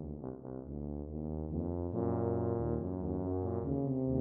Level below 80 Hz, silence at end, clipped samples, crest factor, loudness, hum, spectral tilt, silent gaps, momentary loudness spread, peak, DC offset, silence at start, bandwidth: -50 dBFS; 0 s; under 0.1%; 16 dB; -37 LUFS; none; -14 dB/octave; none; 10 LU; -20 dBFS; under 0.1%; 0 s; 2.3 kHz